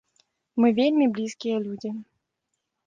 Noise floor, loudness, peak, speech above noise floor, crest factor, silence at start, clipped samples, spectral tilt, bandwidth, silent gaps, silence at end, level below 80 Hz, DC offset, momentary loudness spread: -80 dBFS; -24 LUFS; -10 dBFS; 57 dB; 16 dB; 0.55 s; under 0.1%; -6 dB/octave; 7.6 kHz; none; 0.85 s; -72 dBFS; under 0.1%; 14 LU